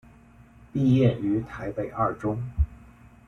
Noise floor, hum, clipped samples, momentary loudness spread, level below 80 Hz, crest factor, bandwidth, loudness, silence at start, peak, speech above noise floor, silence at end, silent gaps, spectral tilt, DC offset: -52 dBFS; none; under 0.1%; 11 LU; -38 dBFS; 18 dB; 6.8 kHz; -26 LUFS; 0.75 s; -8 dBFS; 28 dB; 0.45 s; none; -9.5 dB/octave; under 0.1%